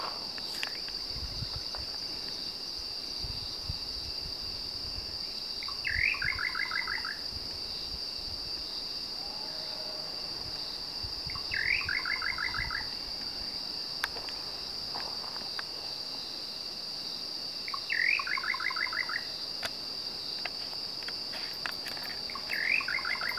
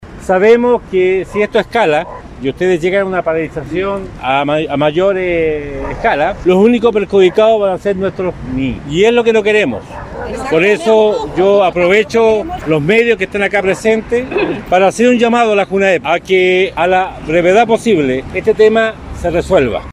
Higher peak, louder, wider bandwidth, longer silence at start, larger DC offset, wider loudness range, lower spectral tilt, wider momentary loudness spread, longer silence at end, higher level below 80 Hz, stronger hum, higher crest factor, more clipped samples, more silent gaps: second, -12 dBFS vs 0 dBFS; second, -33 LUFS vs -12 LUFS; first, 16 kHz vs 12 kHz; about the same, 0 s vs 0 s; first, 0.1% vs under 0.1%; about the same, 4 LU vs 3 LU; second, -1.5 dB/octave vs -5.5 dB/octave; about the same, 7 LU vs 9 LU; about the same, 0 s vs 0 s; second, -54 dBFS vs -36 dBFS; neither; first, 24 dB vs 12 dB; neither; neither